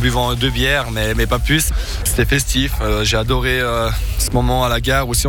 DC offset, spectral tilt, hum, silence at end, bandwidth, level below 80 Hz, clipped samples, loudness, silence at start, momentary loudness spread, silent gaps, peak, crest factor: under 0.1%; -4 dB/octave; none; 0 s; 19.5 kHz; -22 dBFS; under 0.1%; -17 LUFS; 0 s; 4 LU; none; -4 dBFS; 12 dB